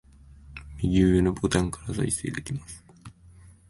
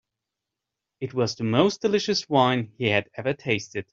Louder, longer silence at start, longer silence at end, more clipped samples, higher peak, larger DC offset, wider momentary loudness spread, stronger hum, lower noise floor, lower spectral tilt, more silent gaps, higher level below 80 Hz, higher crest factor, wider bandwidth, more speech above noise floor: about the same, -26 LUFS vs -24 LUFS; second, 0.45 s vs 1 s; first, 0.6 s vs 0.1 s; neither; about the same, -8 dBFS vs -6 dBFS; neither; first, 23 LU vs 8 LU; neither; second, -52 dBFS vs -86 dBFS; about the same, -6 dB/octave vs -5 dB/octave; neither; first, -40 dBFS vs -64 dBFS; about the same, 20 dB vs 20 dB; first, 11.5 kHz vs 7.6 kHz; second, 27 dB vs 62 dB